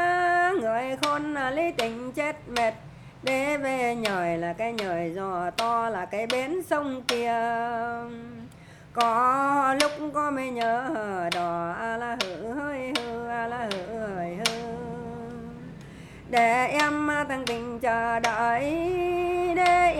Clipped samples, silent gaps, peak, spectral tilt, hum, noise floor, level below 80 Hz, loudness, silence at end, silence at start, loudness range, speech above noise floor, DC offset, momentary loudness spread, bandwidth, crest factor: under 0.1%; none; -4 dBFS; -4 dB/octave; none; -48 dBFS; -56 dBFS; -27 LUFS; 0 s; 0 s; 5 LU; 21 dB; under 0.1%; 13 LU; 18.5 kHz; 22 dB